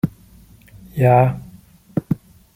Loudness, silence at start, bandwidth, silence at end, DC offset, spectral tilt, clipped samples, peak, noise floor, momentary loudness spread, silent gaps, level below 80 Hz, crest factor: -19 LUFS; 0.05 s; 16 kHz; 0.4 s; under 0.1%; -9.5 dB/octave; under 0.1%; -2 dBFS; -47 dBFS; 16 LU; none; -48 dBFS; 18 dB